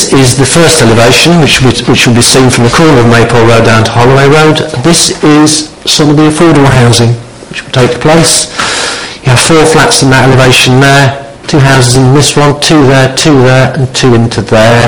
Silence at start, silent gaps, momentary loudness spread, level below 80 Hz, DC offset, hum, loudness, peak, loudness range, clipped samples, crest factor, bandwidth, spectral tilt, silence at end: 0 s; none; 6 LU; -28 dBFS; 4%; none; -4 LUFS; 0 dBFS; 2 LU; 7%; 4 dB; over 20 kHz; -4.5 dB/octave; 0 s